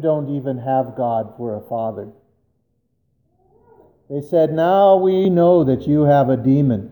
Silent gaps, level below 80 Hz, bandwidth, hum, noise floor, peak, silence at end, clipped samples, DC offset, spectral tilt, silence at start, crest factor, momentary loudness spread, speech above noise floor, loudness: none; -54 dBFS; over 20 kHz; none; -68 dBFS; -2 dBFS; 0 s; under 0.1%; under 0.1%; -10 dB/octave; 0 s; 14 dB; 14 LU; 51 dB; -17 LUFS